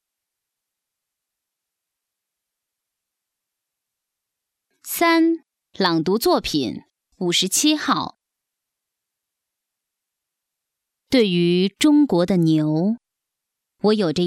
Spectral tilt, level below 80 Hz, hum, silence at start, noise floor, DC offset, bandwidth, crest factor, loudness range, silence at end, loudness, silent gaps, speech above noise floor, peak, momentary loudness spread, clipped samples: -4.5 dB/octave; -58 dBFS; none; 4.85 s; -84 dBFS; under 0.1%; 16 kHz; 20 dB; 7 LU; 0 s; -19 LUFS; none; 65 dB; -4 dBFS; 11 LU; under 0.1%